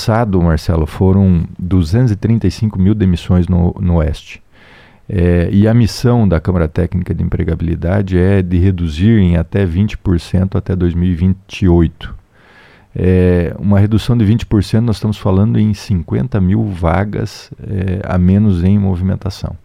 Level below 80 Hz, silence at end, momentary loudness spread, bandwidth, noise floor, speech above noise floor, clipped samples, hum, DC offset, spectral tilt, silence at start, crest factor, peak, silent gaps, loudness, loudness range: -28 dBFS; 0.1 s; 7 LU; 10.5 kHz; -44 dBFS; 32 dB; under 0.1%; none; under 0.1%; -8.5 dB/octave; 0 s; 12 dB; 0 dBFS; none; -14 LUFS; 2 LU